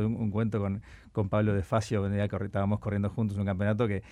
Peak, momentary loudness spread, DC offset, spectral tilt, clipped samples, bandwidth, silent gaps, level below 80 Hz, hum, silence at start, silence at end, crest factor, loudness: -14 dBFS; 5 LU; under 0.1%; -8 dB/octave; under 0.1%; 10.5 kHz; none; -52 dBFS; none; 0 s; 0 s; 14 dB; -30 LUFS